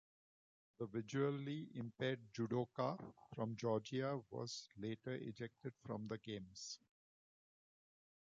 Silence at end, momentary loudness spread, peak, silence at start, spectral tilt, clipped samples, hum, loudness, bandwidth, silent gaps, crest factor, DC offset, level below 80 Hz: 1.6 s; 10 LU; -28 dBFS; 0.8 s; -5.5 dB/octave; under 0.1%; none; -46 LUFS; 7.6 kHz; none; 18 dB; under 0.1%; -80 dBFS